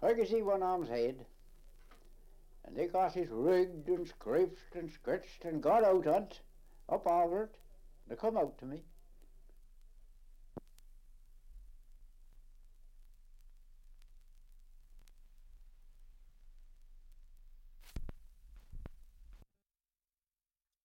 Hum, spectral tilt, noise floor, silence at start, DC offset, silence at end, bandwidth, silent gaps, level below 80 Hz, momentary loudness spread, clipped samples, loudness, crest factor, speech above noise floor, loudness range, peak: none; -7 dB/octave; under -90 dBFS; 0 s; under 0.1%; 1.45 s; 16.5 kHz; none; -56 dBFS; 24 LU; under 0.1%; -34 LUFS; 18 dB; over 56 dB; 24 LU; -20 dBFS